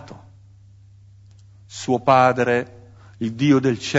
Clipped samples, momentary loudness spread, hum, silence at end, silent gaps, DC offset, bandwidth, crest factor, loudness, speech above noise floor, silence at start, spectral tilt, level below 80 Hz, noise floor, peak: under 0.1%; 17 LU; none; 0 s; none; under 0.1%; 8 kHz; 20 dB; -19 LUFS; 30 dB; 0 s; -6 dB/octave; -58 dBFS; -48 dBFS; -2 dBFS